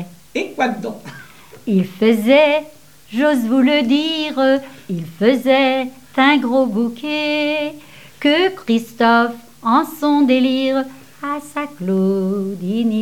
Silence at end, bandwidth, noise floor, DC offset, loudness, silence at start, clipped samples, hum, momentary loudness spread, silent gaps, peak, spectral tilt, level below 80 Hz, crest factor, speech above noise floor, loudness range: 0 s; 17 kHz; -41 dBFS; 0.4%; -17 LUFS; 0 s; under 0.1%; none; 13 LU; none; 0 dBFS; -5.5 dB/octave; -62 dBFS; 16 dB; 25 dB; 2 LU